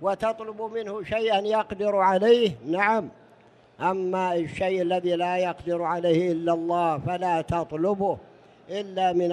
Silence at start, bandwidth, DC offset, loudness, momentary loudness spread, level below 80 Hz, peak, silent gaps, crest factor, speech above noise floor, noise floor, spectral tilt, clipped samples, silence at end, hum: 0 s; 10.5 kHz; under 0.1%; -25 LUFS; 10 LU; -56 dBFS; -8 dBFS; none; 18 dB; 31 dB; -55 dBFS; -6.5 dB/octave; under 0.1%; 0 s; none